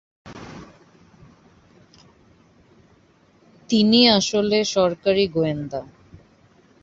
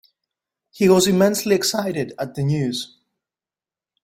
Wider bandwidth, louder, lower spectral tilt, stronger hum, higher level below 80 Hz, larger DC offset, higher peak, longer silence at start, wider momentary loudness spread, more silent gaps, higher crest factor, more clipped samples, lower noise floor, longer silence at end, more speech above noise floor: second, 7.8 kHz vs 16.5 kHz; about the same, -19 LUFS vs -19 LUFS; about the same, -4.5 dB/octave vs -5 dB/octave; neither; about the same, -56 dBFS vs -58 dBFS; neither; about the same, -2 dBFS vs -2 dBFS; second, 0.25 s vs 0.75 s; first, 25 LU vs 12 LU; neither; about the same, 20 dB vs 18 dB; neither; second, -57 dBFS vs under -90 dBFS; second, 1 s vs 1.15 s; second, 38 dB vs over 71 dB